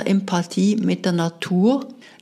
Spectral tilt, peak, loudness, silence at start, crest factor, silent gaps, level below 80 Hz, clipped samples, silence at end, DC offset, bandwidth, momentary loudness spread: -6.5 dB/octave; -6 dBFS; -20 LUFS; 0 s; 14 dB; none; -70 dBFS; under 0.1%; 0.25 s; under 0.1%; 12 kHz; 5 LU